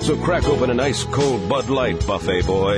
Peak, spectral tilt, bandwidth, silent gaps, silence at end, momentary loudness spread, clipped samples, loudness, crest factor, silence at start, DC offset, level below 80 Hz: -6 dBFS; -5.5 dB/octave; 11 kHz; none; 0 s; 2 LU; under 0.1%; -20 LUFS; 12 dB; 0 s; under 0.1%; -32 dBFS